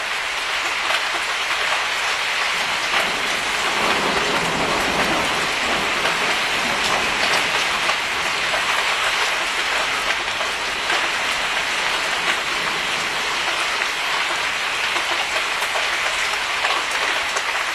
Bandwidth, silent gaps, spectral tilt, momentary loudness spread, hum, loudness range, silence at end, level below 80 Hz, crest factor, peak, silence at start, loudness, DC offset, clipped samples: 14 kHz; none; -1 dB/octave; 2 LU; none; 1 LU; 0 s; -50 dBFS; 18 dB; -4 dBFS; 0 s; -19 LUFS; under 0.1%; under 0.1%